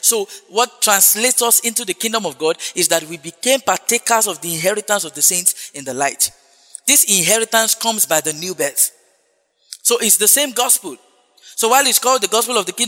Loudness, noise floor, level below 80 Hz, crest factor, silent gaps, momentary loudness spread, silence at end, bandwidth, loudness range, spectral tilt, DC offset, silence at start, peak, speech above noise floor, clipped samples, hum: -14 LUFS; -62 dBFS; -68 dBFS; 18 dB; none; 10 LU; 0 s; over 20 kHz; 2 LU; -0.5 dB/octave; under 0.1%; 0.05 s; 0 dBFS; 46 dB; under 0.1%; none